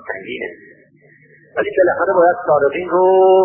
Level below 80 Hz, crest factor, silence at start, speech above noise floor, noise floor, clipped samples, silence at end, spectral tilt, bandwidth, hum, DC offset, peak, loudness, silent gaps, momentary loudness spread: -56 dBFS; 14 dB; 0.05 s; 36 dB; -49 dBFS; under 0.1%; 0 s; -11 dB/octave; 3.3 kHz; none; under 0.1%; -2 dBFS; -15 LUFS; none; 15 LU